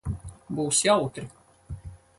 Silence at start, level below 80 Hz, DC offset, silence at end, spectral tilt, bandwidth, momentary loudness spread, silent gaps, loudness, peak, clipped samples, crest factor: 0.05 s; -46 dBFS; under 0.1%; 0.2 s; -3.5 dB/octave; 12 kHz; 22 LU; none; -25 LUFS; -8 dBFS; under 0.1%; 20 dB